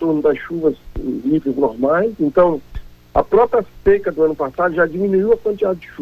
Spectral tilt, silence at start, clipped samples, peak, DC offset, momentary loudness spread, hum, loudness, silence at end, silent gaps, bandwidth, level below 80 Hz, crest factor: -9 dB/octave; 0 s; under 0.1%; -2 dBFS; under 0.1%; 6 LU; none; -17 LUFS; 0 s; none; 13.5 kHz; -38 dBFS; 14 dB